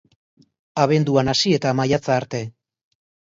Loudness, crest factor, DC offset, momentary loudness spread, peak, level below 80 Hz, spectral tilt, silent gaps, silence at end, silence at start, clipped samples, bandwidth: -20 LUFS; 20 dB; under 0.1%; 12 LU; -2 dBFS; -52 dBFS; -5.5 dB/octave; none; 0.75 s; 0.75 s; under 0.1%; 7.8 kHz